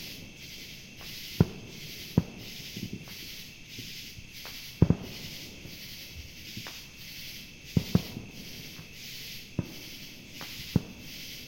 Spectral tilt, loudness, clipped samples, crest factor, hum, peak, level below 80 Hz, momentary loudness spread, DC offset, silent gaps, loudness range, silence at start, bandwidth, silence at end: -5.5 dB/octave; -36 LUFS; under 0.1%; 28 dB; none; -8 dBFS; -50 dBFS; 14 LU; under 0.1%; none; 3 LU; 0 s; 16.5 kHz; 0 s